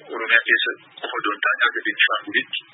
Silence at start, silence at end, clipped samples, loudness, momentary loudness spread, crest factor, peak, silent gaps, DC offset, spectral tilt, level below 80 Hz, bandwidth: 0.05 s; 0.15 s; under 0.1%; -19 LUFS; 9 LU; 22 dB; 0 dBFS; none; under 0.1%; -6 dB/octave; -90 dBFS; 4.1 kHz